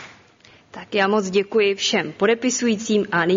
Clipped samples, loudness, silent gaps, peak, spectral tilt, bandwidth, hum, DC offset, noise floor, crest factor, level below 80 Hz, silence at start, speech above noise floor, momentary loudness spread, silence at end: under 0.1%; -20 LUFS; none; -4 dBFS; -3.5 dB/octave; 7.6 kHz; none; under 0.1%; -51 dBFS; 16 dB; -64 dBFS; 0 s; 32 dB; 3 LU; 0 s